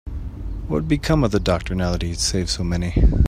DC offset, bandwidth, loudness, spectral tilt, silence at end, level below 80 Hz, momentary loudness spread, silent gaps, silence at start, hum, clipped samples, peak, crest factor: under 0.1%; 14.5 kHz; -21 LUFS; -5.5 dB/octave; 0 s; -24 dBFS; 13 LU; none; 0.05 s; none; under 0.1%; -4 dBFS; 16 dB